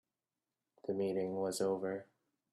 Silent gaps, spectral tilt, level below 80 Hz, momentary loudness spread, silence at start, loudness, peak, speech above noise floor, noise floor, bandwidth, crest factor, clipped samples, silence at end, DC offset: none; -5.5 dB/octave; -82 dBFS; 9 LU; 0.85 s; -38 LUFS; -24 dBFS; over 53 dB; under -90 dBFS; 12 kHz; 16 dB; under 0.1%; 0.5 s; under 0.1%